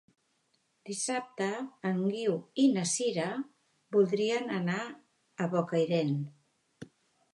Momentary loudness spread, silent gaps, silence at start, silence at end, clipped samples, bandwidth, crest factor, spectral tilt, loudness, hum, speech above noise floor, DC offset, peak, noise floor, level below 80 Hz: 11 LU; none; 0.85 s; 0.5 s; under 0.1%; 11.5 kHz; 18 dB; -5 dB/octave; -31 LUFS; none; 44 dB; under 0.1%; -14 dBFS; -75 dBFS; -82 dBFS